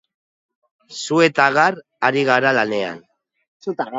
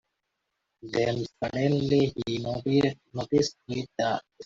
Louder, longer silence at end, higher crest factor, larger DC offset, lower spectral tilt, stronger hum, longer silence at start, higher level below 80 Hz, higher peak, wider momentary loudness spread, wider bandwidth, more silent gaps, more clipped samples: first, -17 LUFS vs -28 LUFS; about the same, 0 s vs 0 s; about the same, 20 dB vs 18 dB; neither; second, -4.5 dB/octave vs -6 dB/octave; neither; about the same, 0.9 s vs 0.85 s; second, -68 dBFS vs -58 dBFS; first, 0 dBFS vs -10 dBFS; first, 16 LU vs 8 LU; about the same, 7.8 kHz vs 7.8 kHz; first, 3.48-3.60 s vs none; neither